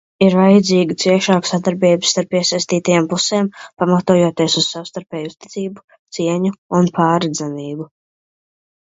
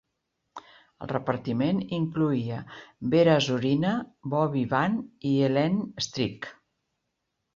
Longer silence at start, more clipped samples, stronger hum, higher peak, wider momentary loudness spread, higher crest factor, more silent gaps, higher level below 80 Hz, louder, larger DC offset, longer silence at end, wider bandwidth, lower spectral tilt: second, 0.2 s vs 0.55 s; neither; neither; first, 0 dBFS vs -8 dBFS; second, 15 LU vs 18 LU; about the same, 16 dB vs 20 dB; first, 5.84-5.88 s, 5.99-6.05 s, 6.58-6.69 s vs none; about the same, -60 dBFS vs -62 dBFS; first, -16 LUFS vs -26 LUFS; neither; about the same, 1 s vs 1.05 s; about the same, 8 kHz vs 7.6 kHz; second, -5 dB/octave vs -6.5 dB/octave